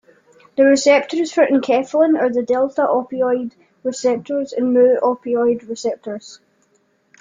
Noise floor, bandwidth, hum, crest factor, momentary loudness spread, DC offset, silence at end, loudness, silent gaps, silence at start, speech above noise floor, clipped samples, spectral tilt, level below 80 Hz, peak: -61 dBFS; 9.4 kHz; none; 16 dB; 13 LU; under 0.1%; 0.85 s; -17 LUFS; none; 0.55 s; 45 dB; under 0.1%; -4 dB/octave; -66 dBFS; -2 dBFS